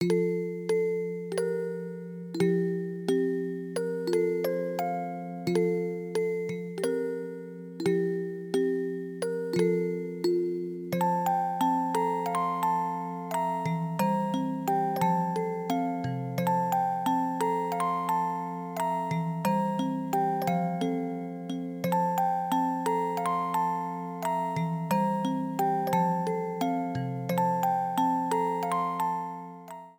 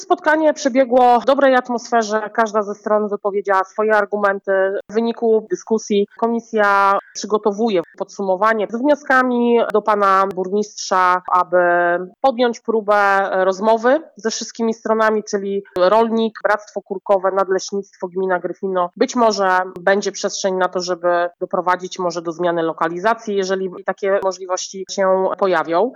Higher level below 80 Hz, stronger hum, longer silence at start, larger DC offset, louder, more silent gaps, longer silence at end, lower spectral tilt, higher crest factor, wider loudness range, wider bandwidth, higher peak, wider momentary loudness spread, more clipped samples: second, -74 dBFS vs -66 dBFS; neither; about the same, 0 s vs 0 s; neither; second, -29 LUFS vs -18 LUFS; neither; about the same, 0.05 s vs 0 s; first, -6.5 dB/octave vs -4 dB/octave; about the same, 16 dB vs 14 dB; about the same, 2 LU vs 4 LU; first, 19.5 kHz vs 11 kHz; second, -14 dBFS vs -2 dBFS; about the same, 7 LU vs 8 LU; neither